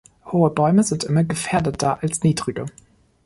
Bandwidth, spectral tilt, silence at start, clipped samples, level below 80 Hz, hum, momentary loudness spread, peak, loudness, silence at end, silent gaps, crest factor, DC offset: 11.5 kHz; -6 dB/octave; 0.25 s; under 0.1%; -50 dBFS; none; 9 LU; -4 dBFS; -20 LUFS; 0.55 s; none; 16 dB; under 0.1%